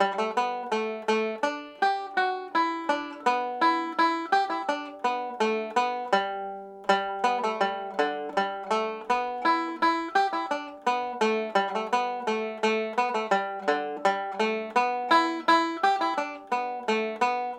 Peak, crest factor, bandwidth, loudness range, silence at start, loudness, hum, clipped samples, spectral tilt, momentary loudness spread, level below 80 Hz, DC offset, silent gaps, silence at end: -8 dBFS; 20 dB; 11 kHz; 2 LU; 0 s; -27 LUFS; none; under 0.1%; -3.5 dB/octave; 6 LU; -72 dBFS; under 0.1%; none; 0 s